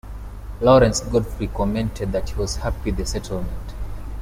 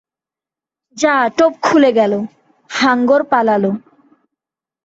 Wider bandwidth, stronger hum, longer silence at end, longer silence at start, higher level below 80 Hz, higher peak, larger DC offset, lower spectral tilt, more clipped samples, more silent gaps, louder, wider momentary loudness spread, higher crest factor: first, 16 kHz vs 8 kHz; first, 50 Hz at -30 dBFS vs none; second, 0 s vs 1.05 s; second, 0.05 s vs 0.95 s; first, -30 dBFS vs -62 dBFS; about the same, -2 dBFS vs -2 dBFS; neither; about the same, -5.5 dB/octave vs -5 dB/octave; neither; neither; second, -21 LUFS vs -14 LUFS; first, 19 LU vs 11 LU; about the same, 18 dB vs 14 dB